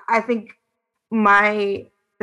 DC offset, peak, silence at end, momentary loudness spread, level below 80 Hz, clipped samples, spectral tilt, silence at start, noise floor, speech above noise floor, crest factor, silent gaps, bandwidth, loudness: under 0.1%; -4 dBFS; 0.4 s; 12 LU; -64 dBFS; under 0.1%; -6 dB/octave; 0.1 s; -77 dBFS; 58 dB; 18 dB; none; 11 kHz; -18 LUFS